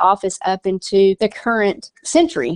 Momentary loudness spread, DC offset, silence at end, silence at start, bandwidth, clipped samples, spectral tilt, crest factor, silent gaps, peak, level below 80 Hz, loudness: 6 LU; under 0.1%; 0 s; 0 s; 11 kHz; under 0.1%; -4.5 dB/octave; 16 dB; none; -2 dBFS; -54 dBFS; -17 LUFS